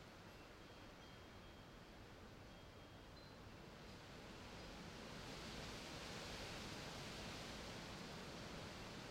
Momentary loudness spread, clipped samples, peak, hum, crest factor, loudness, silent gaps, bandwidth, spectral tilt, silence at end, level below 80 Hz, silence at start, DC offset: 9 LU; under 0.1%; -40 dBFS; none; 16 dB; -54 LUFS; none; 16 kHz; -4 dB/octave; 0 s; -66 dBFS; 0 s; under 0.1%